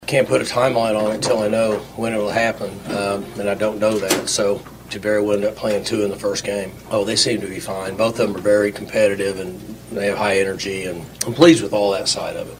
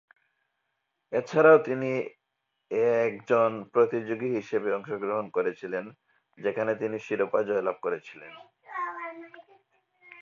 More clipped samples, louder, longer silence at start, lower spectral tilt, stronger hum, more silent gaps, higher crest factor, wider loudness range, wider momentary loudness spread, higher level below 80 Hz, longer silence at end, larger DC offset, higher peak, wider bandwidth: neither; first, -19 LUFS vs -27 LUFS; second, 0 s vs 1.1 s; second, -4 dB/octave vs -7 dB/octave; neither; neither; about the same, 20 dB vs 20 dB; second, 2 LU vs 7 LU; second, 9 LU vs 18 LU; first, -50 dBFS vs -78 dBFS; about the same, 0 s vs 0.1 s; neither; first, 0 dBFS vs -8 dBFS; first, 16 kHz vs 7 kHz